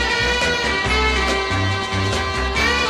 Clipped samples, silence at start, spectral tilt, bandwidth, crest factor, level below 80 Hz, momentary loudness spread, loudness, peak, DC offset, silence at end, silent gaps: under 0.1%; 0 s; -3.5 dB/octave; 14.5 kHz; 14 dB; -28 dBFS; 3 LU; -18 LUFS; -6 dBFS; under 0.1%; 0 s; none